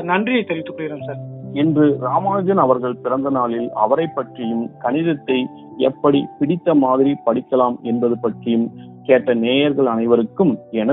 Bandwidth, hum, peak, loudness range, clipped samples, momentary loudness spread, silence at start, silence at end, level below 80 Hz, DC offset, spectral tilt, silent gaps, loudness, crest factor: 4 kHz; none; 0 dBFS; 2 LU; under 0.1%; 10 LU; 0 s; 0 s; -62 dBFS; under 0.1%; -5.5 dB/octave; none; -18 LUFS; 18 dB